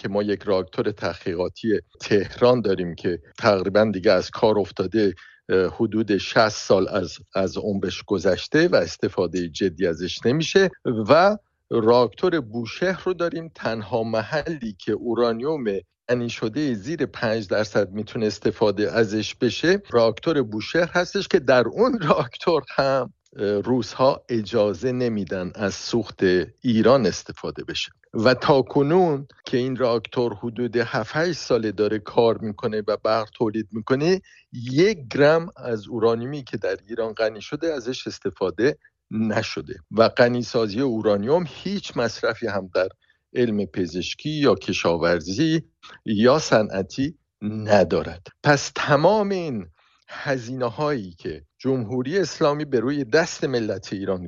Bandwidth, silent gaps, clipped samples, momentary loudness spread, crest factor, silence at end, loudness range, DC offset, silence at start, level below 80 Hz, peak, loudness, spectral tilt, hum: 7.6 kHz; none; under 0.1%; 10 LU; 20 dB; 0 s; 4 LU; under 0.1%; 0.05 s; -54 dBFS; -4 dBFS; -22 LUFS; -5.5 dB/octave; none